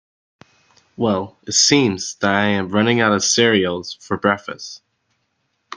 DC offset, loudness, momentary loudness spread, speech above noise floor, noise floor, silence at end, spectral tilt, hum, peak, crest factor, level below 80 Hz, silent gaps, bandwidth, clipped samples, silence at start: under 0.1%; -17 LUFS; 13 LU; 52 dB; -70 dBFS; 0 s; -3 dB/octave; none; 0 dBFS; 18 dB; -60 dBFS; none; 10.5 kHz; under 0.1%; 1 s